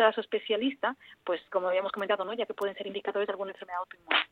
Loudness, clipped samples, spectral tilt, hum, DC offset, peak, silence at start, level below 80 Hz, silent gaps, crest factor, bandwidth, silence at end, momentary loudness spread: -32 LUFS; under 0.1%; -5 dB/octave; none; under 0.1%; -8 dBFS; 0 s; -78 dBFS; none; 22 dB; 16 kHz; 0.05 s; 9 LU